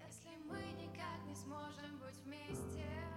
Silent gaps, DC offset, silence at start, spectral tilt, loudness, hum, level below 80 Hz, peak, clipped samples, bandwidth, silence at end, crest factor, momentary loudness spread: none; under 0.1%; 0 s; -5 dB/octave; -50 LUFS; none; -68 dBFS; -34 dBFS; under 0.1%; 16.5 kHz; 0 s; 14 dB; 6 LU